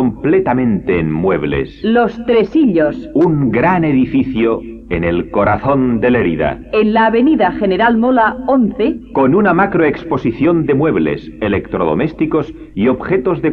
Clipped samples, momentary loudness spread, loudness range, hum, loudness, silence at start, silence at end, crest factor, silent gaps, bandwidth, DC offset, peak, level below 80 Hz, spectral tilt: under 0.1%; 6 LU; 2 LU; none; -14 LUFS; 0 s; 0 s; 12 dB; none; 5.4 kHz; under 0.1%; 0 dBFS; -36 dBFS; -9.5 dB/octave